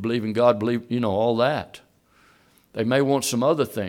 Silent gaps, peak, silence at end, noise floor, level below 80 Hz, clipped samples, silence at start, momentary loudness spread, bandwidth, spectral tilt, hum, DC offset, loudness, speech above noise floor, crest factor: none; -4 dBFS; 0 s; -58 dBFS; -64 dBFS; under 0.1%; 0 s; 9 LU; 17 kHz; -5.5 dB/octave; none; under 0.1%; -22 LUFS; 36 dB; 18 dB